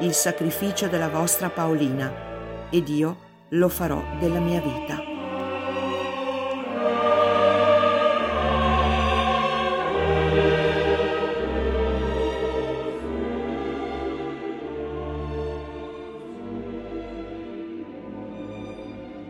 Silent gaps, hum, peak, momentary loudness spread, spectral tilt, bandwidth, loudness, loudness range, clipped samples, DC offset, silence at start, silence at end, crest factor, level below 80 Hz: none; none; -8 dBFS; 16 LU; -4.5 dB/octave; 16.5 kHz; -24 LUFS; 13 LU; under 0.1%; under 0.1%; 0 s; 0 s; 16 dB; -38 dBFS